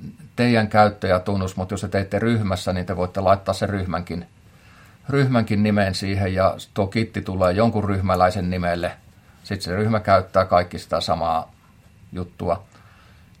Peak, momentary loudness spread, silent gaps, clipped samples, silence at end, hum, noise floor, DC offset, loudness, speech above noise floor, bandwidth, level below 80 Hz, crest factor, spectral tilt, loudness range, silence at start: 0 dBFS; 11 LU; none; under 0.1%; 0.75 s; none; -50 dBFS; under 0.1%; -21 LUFS; 30 dB; 16 kHz; -52 dBFS; 20 dB; -6.5 dB/octave; 3 LU; 0 s